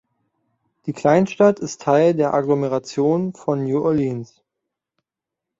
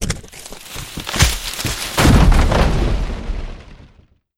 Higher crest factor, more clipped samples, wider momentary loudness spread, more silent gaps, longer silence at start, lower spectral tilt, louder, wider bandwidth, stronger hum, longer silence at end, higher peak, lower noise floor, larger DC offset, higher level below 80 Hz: about the same, 18 dB vs 16 dB; neither; second, 9 LU vs 18 LU; neither; first, 0.85 s vs 0 s; first, -7 dB/octave vs -4.5 dB/octave; about the same, -19 LUFS vs -17 LUFS; second, 8 kHz vs 17 kHz; neither; first, 1.35 s vs 0.65 s; about the same, -2 dBFS vs 0 dBFS; first, -85 dBFS vs -51 dBFS; neither; second, -60 dBFS vs -20 dBFS